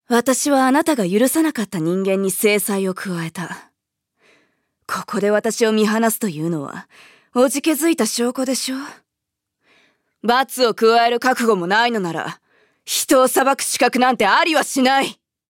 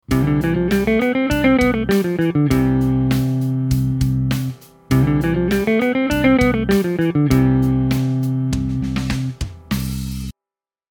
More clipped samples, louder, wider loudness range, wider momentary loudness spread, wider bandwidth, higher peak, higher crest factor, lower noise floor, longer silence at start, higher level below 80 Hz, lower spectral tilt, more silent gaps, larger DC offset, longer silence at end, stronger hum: neither; about the same, -18 LUFS vs -18 LUFS; about the same, 5 LU vs 3 LU; first, 13 LU vs 9 LU; second, 17 kHz vs over 20 kHz; about the same, -2 dBFS vs -2 dBFS; about the same, 16 dB vs 16 dB; second, -81 dBFS vs -90 dBFS; about the same, 0.1 s vs 0.1 s; second, -66 dBFS vs -32 dBFS; second, -3.5 dB/octave vs -7 dB/octave; neither; neither; second, 0.35 s vs 0.6 s; neither